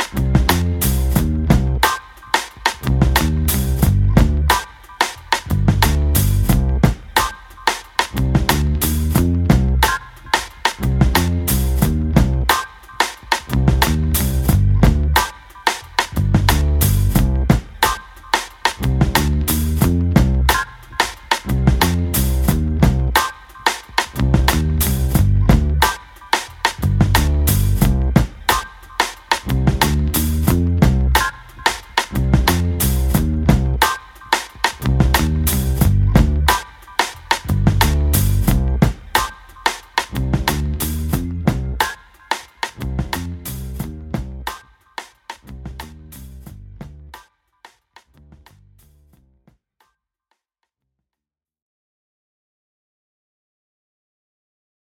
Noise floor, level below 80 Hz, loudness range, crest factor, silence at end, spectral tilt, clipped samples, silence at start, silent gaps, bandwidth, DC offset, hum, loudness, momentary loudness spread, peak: -87 dBFS; -22 dBFS; 6 LU; 18 dB; 7.65 s; -5 dB/octave; under 0.1%; 0 s; none; 18.5 kHz; under 0.1%; none; -18 LUFS; 10 LU; 0 dBFS